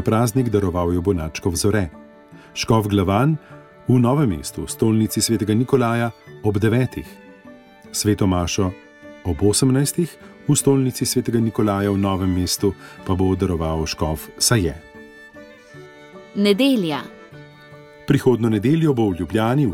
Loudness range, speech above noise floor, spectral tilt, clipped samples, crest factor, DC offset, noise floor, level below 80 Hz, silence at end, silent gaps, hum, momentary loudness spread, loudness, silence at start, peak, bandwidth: 3 LU; 26 dB; -5.5 dB/octave; under 0.1%; 16 dB; under 0.1%; -44 dBFS; -42 dBFS; 0 s; none; none; 11 LU; -20 LUFS; 0 s; -4 dBFS; 17 kHz